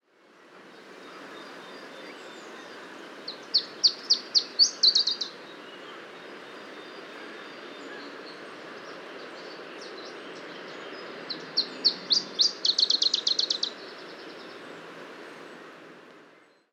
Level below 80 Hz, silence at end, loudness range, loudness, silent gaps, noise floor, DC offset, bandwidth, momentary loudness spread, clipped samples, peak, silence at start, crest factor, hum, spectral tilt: under -90 dBFS; 0.45 s; 18 LU; -23 LUFS; none; -57 dBFS; under 0.1%; 15.5 kHz; 22 LU; under 0.1%; -8 dBFS; 0.4 s; 24 dB; none; 0 dB/octave